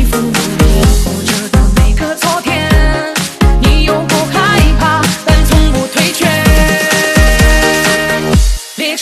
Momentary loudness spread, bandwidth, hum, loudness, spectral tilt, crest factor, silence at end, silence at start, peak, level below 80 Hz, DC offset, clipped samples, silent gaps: 5 LU; 14 kHz; none; -10 LUFS; -4.5 dB/octave; 10 dB; 0 s; 0 s; 0 dBFS; -12 dBFS; under 0.1%; 0.3%; none